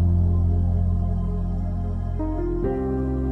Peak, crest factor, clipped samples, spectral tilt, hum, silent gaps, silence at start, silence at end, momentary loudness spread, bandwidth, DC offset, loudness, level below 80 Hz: -12 dBFS; 10 dB; under 0.1%; -11.5 dB/octave; none; none; 0 s; 0 s; 6 LU; 2.2 kHz; under 0.1%; -25 LUFS; -28 dBFS